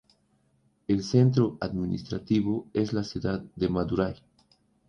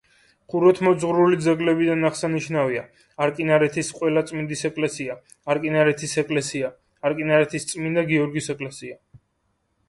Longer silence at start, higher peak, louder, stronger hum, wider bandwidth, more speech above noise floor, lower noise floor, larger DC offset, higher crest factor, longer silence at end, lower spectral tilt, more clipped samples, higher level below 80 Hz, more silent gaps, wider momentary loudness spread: first, 0.9 s vs 0.5 s; second, -10 dBFS vs -4 dBFS; second, -28 LUFS vs -22 LUFS; neither; second, 7.2 kHz vs 11.5 kHz; second, 42 dB vs 49 dB; about the same, -68 dBFS vs -71 dBFS; neither; about the same, 20 dB vs 18 dB; about the same, 0.75 s vs 0.7 s; first, -7.5 dB/octave vs -5.5 dB/octave; neither; first, -52 dBFS vs -62 dBFS; neither; about the same, 10 LU vs 12 LU